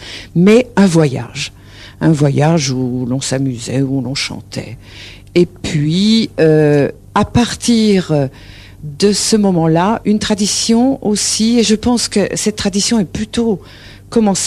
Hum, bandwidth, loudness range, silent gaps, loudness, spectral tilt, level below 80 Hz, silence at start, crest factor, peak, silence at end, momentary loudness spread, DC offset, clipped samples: none; 13.5 kHz; 4 LU; none; -14 LUFS; -5 dB/octave; -40 dBFS; 0 s; 14 dB; 0 dBFS; 0 s; 11 LU; under 0.1%; under 0.1%